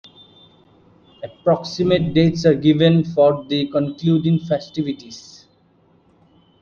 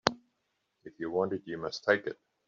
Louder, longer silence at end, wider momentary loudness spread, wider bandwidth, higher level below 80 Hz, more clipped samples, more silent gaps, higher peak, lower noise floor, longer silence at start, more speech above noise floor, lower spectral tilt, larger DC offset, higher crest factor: first, -18 LUFS vs -33 LUFS; first, 1.4 s vs 0.35 s; first, 16 LU vs 12 LU; about the same, 7 kHz vs 7.6 kHz; first, -52 dBFS vs -68 dBFS; neither; neither; about the same, -2 dBFS vs -4 dBFS; second, -56 dBFS vs -80 dBFS; first, 1.2 s vs 0.05 s; second, 39 dB vs 48 dB; first, -7.5 dB/octave vs -2.5 dB/octave; neither; second, 16 dB vs 30 dB